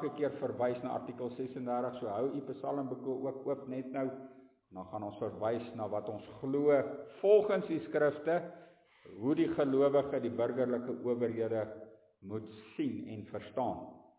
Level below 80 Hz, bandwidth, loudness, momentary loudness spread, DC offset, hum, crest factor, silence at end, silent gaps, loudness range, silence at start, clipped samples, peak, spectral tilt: -72 dBFS; 4 kHz; -35 LUFS; 15 LU; under 0.1%; none; 20 dB; 0.2 s; none; 7 LU; 0 s; under 0.1%; -14 dBFS; -6.5 dB/octave